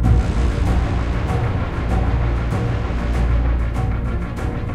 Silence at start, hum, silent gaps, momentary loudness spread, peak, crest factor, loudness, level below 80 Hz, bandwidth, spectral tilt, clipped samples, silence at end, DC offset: 0 s; none; none; 4 LU; -4 dBFS; 14 dB; -21 LUFS; -20 dBFS; 9.4 kHz; -7.5 dB/octave; under 0.1%; 0 s; under 0.1%